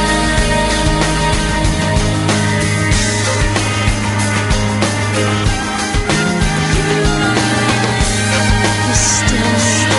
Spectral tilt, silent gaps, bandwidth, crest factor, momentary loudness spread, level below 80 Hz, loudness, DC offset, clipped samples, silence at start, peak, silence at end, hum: -4 dB/octave; none; 11.5 kHz; 14 dB; 3 LU; -22 dBFS; -14 LUFS; under 0.1%; under 0.1%; 0 s; 0 dBFS; 0 s; none